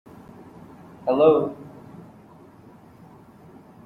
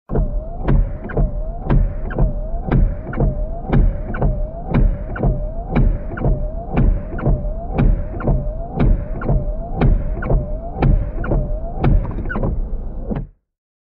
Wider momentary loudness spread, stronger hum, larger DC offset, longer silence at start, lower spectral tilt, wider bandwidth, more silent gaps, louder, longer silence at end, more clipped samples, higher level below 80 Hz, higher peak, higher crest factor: first, 28 LU vs 8 LU; neither; neither; first, 1.05 s vs 0.1 s; second, -8.5 dB/octave vs -12 dB/octave; first, 4.5 kHz vs 4 kHz; neither; about the same, -21 LUFS vs -21 LUFS; first, 2.15 s vs 0.55 s; neither; second, -64 dBFS vs -20 dBFS; about the same, -4 dBFS vs -4 dBFS; first, 22 dB vs 14 dB